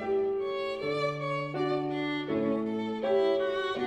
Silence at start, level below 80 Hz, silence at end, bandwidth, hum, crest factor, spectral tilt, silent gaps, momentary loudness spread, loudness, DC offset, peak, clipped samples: 0 s; -66 dBFS; 0 s; 8.8 kHz; none; 14 dB; -6.5 dB/octave; none; 5 LU; -30 LUFS; under 0.1%; -16 dBFS; under 0.1%